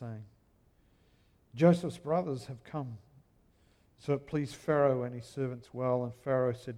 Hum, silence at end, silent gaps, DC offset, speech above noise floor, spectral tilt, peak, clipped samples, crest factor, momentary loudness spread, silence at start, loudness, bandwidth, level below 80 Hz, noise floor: none; 0 s; none; under 0.1%; 36 dB; -8 dB/octave; -12 dBFS; under 0.1%; 22 dB; 18 LU; 0 s; -32 LUFS; 11.5 kHz; -66 dBFS; -67 dBFS